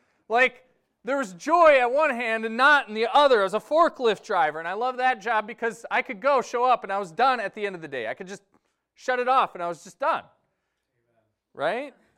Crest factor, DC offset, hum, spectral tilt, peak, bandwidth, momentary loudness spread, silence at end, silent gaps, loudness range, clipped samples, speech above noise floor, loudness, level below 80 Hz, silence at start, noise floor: 18 dB; under 0.1%; none; -3.5 dB/octave; -6 dBFS; 13 kHz; 14 LU; 0.25 s; none; 8 LU; under 0.1%; 54 dB; -23 LUFS; -66 dBFS; 0.3 s; -77 dBFS